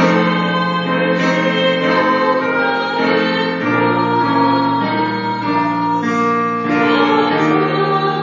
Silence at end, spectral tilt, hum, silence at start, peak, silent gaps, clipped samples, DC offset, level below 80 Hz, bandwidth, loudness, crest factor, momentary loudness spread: 0 s; -6.5 dB/octave; none; 0 s; 0 dBFS; none; under 0.1%; under 0.1%; -58 dBFS; 7.6 kHz; -15 LUFS; 14 dB; 3 LU